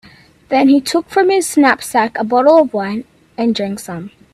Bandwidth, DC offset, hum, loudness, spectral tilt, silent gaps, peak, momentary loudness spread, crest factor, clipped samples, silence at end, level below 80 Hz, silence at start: 14.5 kHz; under 0.1%; none; -14 LUFS; -4 dB/octave; none; 0 dBFS; 15 LU; 14 dB; under 0.1%; 0.25 s; -58 dBFS; 0.5 s